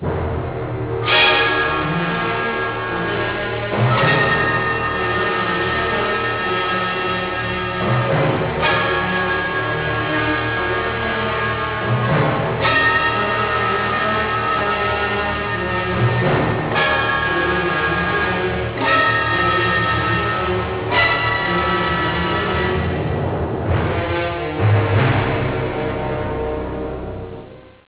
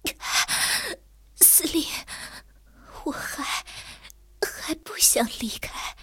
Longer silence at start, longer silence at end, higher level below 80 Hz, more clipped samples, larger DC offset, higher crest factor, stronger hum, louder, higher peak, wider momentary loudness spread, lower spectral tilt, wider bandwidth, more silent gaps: about the same, 0 s vs 0.05 s; first, 0.25 s vs 0 s; first, -34 dBFS vs -50 dBFS; neither; neither; second, 14 dB vs 24 dB; neither; first, -18 LUFS vs -22 LUFS; about the same, -4 dBFS vs -2 dBFS; second, 7 LU vs 22 LU; first, -9 dB/octave vs 0 dB/octave; second, 4 kHz vs 17 kHz; neither